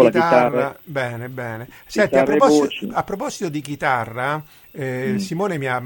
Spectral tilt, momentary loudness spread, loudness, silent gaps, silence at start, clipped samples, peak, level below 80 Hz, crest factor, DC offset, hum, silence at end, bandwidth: -5.5 dB/octave; 14 LU; -20 LUFS; none; 0 s; under 0.1%; 0 dBFS; -54 dBFS; 18 dB; under 0.1%; none; 0 s; 17 kHz